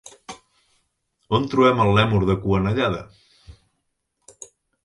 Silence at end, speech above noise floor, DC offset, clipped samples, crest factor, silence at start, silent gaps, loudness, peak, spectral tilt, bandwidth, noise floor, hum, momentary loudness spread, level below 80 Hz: 1.35 s; 56 dB; under 0.1%; under 0.1%; 20 dB; 0.05 s; none; -20 LUFS; -4 dBFS; -6.5 dB/octave; 11.5 kHz; -74 dBFS; none; 24 LU; -42 dBFS